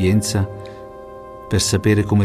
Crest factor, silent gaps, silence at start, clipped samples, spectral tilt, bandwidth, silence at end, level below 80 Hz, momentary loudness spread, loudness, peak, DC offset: 14 dB; none; 0 s; under 0.1%; -5 dB/octave; 14.5 kHz; 0 s; -42 dBFS; 20 LU; -19 LUFS; -4 dBFS; under 0.1%